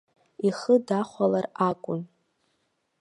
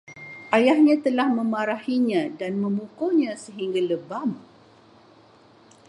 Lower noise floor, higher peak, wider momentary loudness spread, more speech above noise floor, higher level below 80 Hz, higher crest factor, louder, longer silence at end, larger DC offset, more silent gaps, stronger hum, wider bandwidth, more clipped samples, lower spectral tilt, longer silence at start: first, -74 dBFS vs -53 dBFS; second, -8 dBFS vs -4 dBFS; about the same, 11 LU vs 12 LU; first, 49 dB vs 31 dB; about the same, -74 dBFS vs -76 dBFS; about the same, 18 dB vs 20 dB; second, -26 LUFS vs -23 LUFS; second, 0.95 s vs 1.5 s; neither; neither; neither; about the same, 11 kHz vs 11.5 kHz; neither; about the same, -7 dB/octave vs -6 dB/octave; first, 0.4 s vs 0.1 s